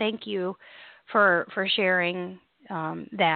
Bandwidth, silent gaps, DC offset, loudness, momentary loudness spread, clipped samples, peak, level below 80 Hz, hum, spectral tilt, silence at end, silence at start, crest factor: 4.7 kHz; none; under 0.1%; -25 LUFS; 15 LU; under 0.1%; -8 dBFS; -72 dBFS; none; -9 dB/octave; 0 s; 0 s; 20 dB